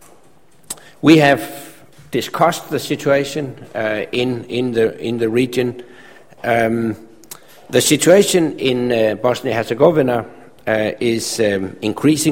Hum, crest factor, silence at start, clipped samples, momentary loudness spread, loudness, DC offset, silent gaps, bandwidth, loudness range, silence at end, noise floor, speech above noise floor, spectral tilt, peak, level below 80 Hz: none; 18 dB; 0.7 s; under 0.1%; 19 LU; -17 LUFS; 0.4%; none; 16.5 kHz; 5 LU; 0 s; -52 dBFS; 36 dB; -4.5 dB/octave; 0 dBFS; -52 dBFS